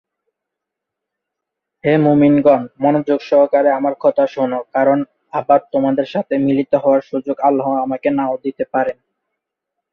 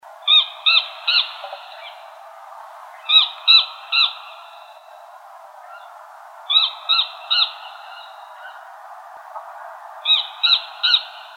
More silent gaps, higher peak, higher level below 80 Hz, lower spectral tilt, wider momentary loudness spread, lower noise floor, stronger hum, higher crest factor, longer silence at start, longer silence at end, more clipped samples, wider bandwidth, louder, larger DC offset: neither; about the same, -2 dBFS vs -2 dBFS; first, -60 dBFS vs under -90 dBFS; first, -9 dB/octave vs 6 dB/octave; second, 8 LU vs 25 LU; first, -81 dBFS vs -42 dBFS; neither; about the same, 16 dB vs 20 dB; first, 1.85 s vs 0.2 s; first, 1 s vs 0.1 s; neither; second, 6.2 kHz vs 16 kHz; about the same, -16 LUFS vs -15 LUFS; neither